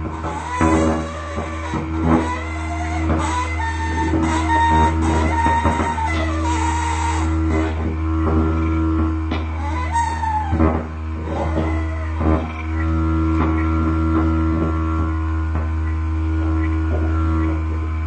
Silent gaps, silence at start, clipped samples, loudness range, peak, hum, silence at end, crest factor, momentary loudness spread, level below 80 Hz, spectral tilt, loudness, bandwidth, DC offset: none; 0 s; under 0.1%; 3 LU; -2 dBFS; none; 0 s; 16 dB; 7 LU; -24 dBFS; -7 dB/octave; -20 LUFS; 9 kHz; under 0.1%